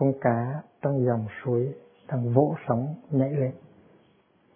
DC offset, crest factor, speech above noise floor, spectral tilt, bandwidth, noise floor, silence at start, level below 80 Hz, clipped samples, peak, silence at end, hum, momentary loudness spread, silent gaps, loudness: under 0.1%; 22 dB; 37 dB; -13.5 dB/octave; 3.5 kHz; -62 dBFS; 0 s; -68 dBFS; under 0.1%; -6 dBFS; 1 s; none; 10 LU; none; -27 LUFS